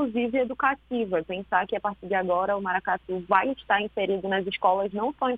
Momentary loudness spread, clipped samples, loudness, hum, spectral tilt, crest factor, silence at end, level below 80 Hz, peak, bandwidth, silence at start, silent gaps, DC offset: 5 LU; under 0.1%; -26 LUFS; none; -8 dB/octave; 22 dB; 0 s; -58 dBFS; -4 dBFS; 4.8 kHz; 0 s; none; under 0.1%